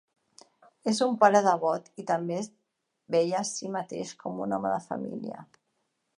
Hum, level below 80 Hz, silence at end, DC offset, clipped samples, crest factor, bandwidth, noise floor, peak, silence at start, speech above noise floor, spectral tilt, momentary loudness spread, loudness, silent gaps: none; -78 dBFS; 0.75 s; under 0.1%; under 0.1%; 22 dB; 11.5 kHz; -78 dBFS; -6 dBFS; 0.85 s; 50 dB; -4.5 dB/octave; 15 LU; -28 LUFS; none